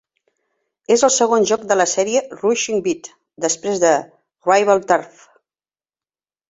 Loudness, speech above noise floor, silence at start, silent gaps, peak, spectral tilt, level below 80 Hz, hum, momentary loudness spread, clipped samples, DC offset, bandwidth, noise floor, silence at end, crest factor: -17 LUFS; over 73 dB; 0.9 s; none; -2 dBFS; -2.5 dB/octave; -64 dBFS; none; 7 LU; under 0.1%; under 0.1%; 8 kHz; under -90 dBFS; 1.4 s; 18 dB